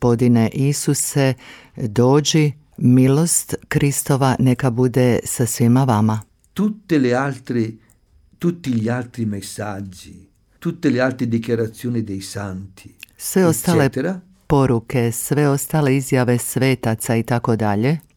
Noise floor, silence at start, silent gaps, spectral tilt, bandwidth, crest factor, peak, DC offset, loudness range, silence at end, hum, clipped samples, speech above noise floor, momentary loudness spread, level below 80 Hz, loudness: -54 dBFS; 0 s; none; -5.5 dB/octave; 18.5 kHz; 16 dB; -2 dBFS; under 0.1%; 7 LU; 0.15 s; none; under 0.1%; 36 dB; 12 LU; -48 dBFS; -18 LUFS